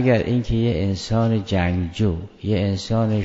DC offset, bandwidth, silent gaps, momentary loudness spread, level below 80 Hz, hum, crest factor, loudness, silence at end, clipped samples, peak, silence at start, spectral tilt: under 0.1%; 8 kHz; none; 3 LU; -38 dBFS; none; 16 dB; -22 LUFS; 0 s; under 0.1%; -4 dBFS; 0 s; -7 dB/octave